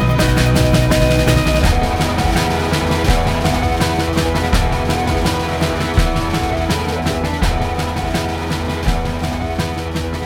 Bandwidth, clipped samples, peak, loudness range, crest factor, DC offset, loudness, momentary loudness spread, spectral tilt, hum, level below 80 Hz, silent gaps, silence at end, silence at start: 18.5 kHz; under 0.1%; 0 dBFS; 4 LU; 16 dB; under 0.1%; -17 LUFS; 7 LU; -5.5 dB/octave; none; -22 dBFS; none; 0 s; 0 s